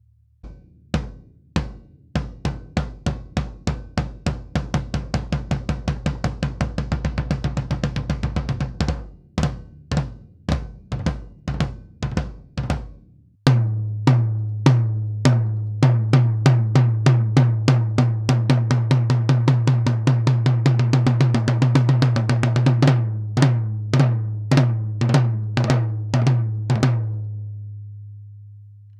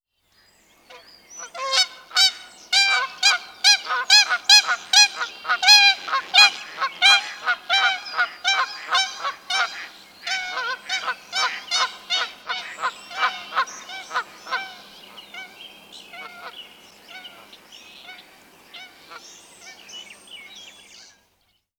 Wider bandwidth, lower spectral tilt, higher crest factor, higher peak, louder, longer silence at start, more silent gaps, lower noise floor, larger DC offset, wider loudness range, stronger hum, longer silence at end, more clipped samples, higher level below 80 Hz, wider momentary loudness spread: second, 9.6 kHz vs over 20 kHz; first, -7.5 dB/octave vs 3.5 dB/octave; about the same, 20 dB vs 22 dB; about the same, 0 dBFS vs 0 dBFS; second, -21 LUFS vs -18 LUFS; second, 0.45 s vs 0.9 s; neither; second, -50 dBFS vs -67 dBFS; neither; second, 10 LU vs 19 LU; neither; second, 0.2 s vs 1.1 s; neither; first, -34 dBFS vs -74 dBFS; second, 12 LU vs 25 LU